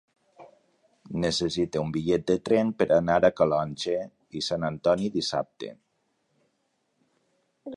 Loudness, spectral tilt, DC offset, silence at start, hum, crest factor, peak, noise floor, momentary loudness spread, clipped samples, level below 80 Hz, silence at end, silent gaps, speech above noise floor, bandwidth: -26 LUFS; -5.5 dB/octave; under 0.1%; 0.4 s; none; 20 dB; -8 dBFS; -74 dBFS; 14 LU; under 0.1%; -56 dBFS; 0 s; none; 49 dB; 11 kHz